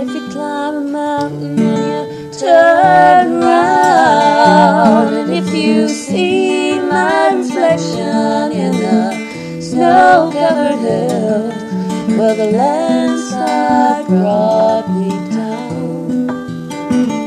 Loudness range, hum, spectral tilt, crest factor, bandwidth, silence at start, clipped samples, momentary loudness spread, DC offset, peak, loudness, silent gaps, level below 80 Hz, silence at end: 5 LU; none; -5.5 dB/octave; 12 dB; 13.5 kHz; 0 s; under 0.1%; 12 LU; under 0.1%; 0 dBFS; -12 LUFS; none; -54 dBFS; 0 s